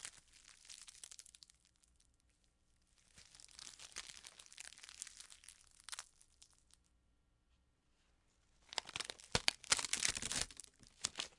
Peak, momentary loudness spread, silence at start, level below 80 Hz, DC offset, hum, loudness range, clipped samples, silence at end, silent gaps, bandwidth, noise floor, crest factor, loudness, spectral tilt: -8 dBFS; 24 LU; 0 s; -68 dBFS; under 0.1%; none; 19 LU; under 0.1%; 0.1 s; none; 12 kHz; -77 dBFS; 40 dB; -41 LUFS; 0 dB/octave